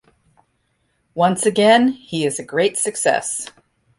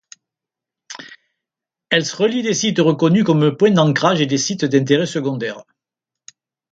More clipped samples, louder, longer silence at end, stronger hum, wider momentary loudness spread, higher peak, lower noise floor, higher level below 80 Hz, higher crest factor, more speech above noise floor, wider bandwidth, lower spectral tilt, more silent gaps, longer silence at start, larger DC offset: neither; about the same, -18 LUFS vs -16 LUFS; second, 0.5 s vs 1.1 s; neither; second, 13 LU vs 18 LU; about the same, -2 dBFS vs 0 dBFS; second, -67 dBFS vs -86 dBFS; about the same, -62 dBFS vs -62 dBFS; about the same, 18 dB vs 18 dB; second, 49 dB vs 70 dB; first, 11.5 kHz vs 9 kHz; second, -3.5 dB/octave vs -5 dB/octave; neither; first, 1.15 s vs 0.9 s; neither